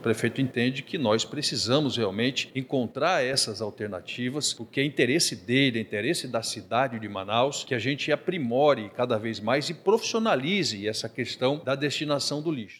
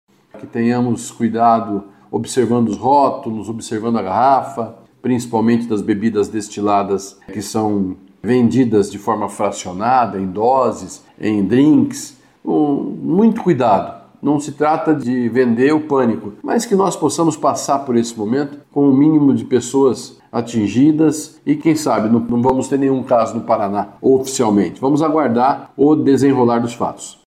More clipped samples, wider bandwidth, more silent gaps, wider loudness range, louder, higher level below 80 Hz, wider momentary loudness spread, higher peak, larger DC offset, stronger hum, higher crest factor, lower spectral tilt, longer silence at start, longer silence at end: neither; about the same, 15 kHz vs 14.5 kHz; neither; about the same, 1 LU vs 3 LU; second, -26 LUFS vs -16 LUFS; second, -72 dBFS vs -56 dBFS; second, 7 LU vs 11 LU; second, -8 dBFS vs -4 dBFS; neither; neither; first, 20 dB vs 12 dB; second, -4 dB/octave vs -6 dB/octave; second, 0 s vs 0.35 s; second, 0 s vs 0.15 s